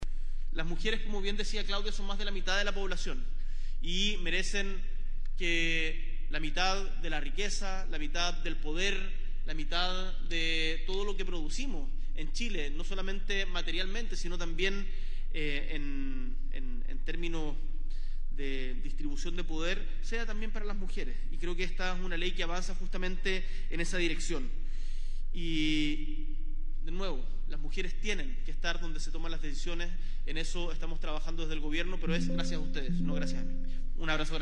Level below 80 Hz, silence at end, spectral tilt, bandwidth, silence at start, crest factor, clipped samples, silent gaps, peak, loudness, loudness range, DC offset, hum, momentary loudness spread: -30 dBFS; 0 s; -4 dB/octave; 8.6 kHz; 0 s; 14 dB; under 0.1%; none; -14 dBFS; -36 LUFS; 5 LU; under 0.1%; none; 11 LU